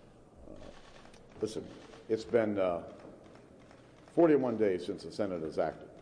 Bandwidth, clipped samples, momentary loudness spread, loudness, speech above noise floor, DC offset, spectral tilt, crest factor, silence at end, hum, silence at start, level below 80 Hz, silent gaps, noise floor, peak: 10.5 kHz; under 0.1%; 25 LU; -32 LUFS; 25 dB; under 0.1%; -7 dB/octave; 18 dB; 0 s; none; 0.4 s; -62 dBFS; none; -56 dBFS; -16 dBFS